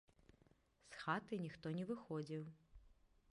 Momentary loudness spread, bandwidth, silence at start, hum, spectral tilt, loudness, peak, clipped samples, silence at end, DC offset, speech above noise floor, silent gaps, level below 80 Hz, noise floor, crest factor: 9 LU; 11 kHz; 0.85 s; none; -7 dB/octave; -47 LUFS; -28 dBFS; under 0.1%; 0.4 s; under 0.1%; 29 dB; none; -74 dBFS; -75 dBFS; 22 dB